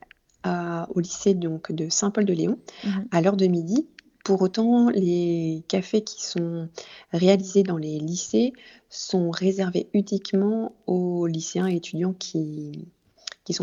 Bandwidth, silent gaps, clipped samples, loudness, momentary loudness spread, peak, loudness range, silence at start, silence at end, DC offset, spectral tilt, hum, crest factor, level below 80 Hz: 7.8 kHz; none; under 0.1%; -24 LUFS; 13 LU; -4 dBFS; 3 LU; 0.45 s; 0 s; under 0.1%; -5.5 dB/octave; none; 20 dB; -66 dBFS